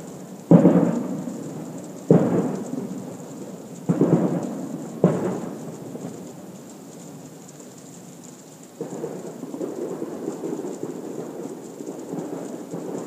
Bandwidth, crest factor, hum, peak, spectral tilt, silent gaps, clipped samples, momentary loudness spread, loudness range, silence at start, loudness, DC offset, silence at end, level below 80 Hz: 15.5 kHz; 24 dB; none; 0 dBFS; -8 dB/octave; none; under 0.1%; 22 LU; 16 LU; 0 s; -25 LUFS; under 0.1%; 0 s; -68 dBFS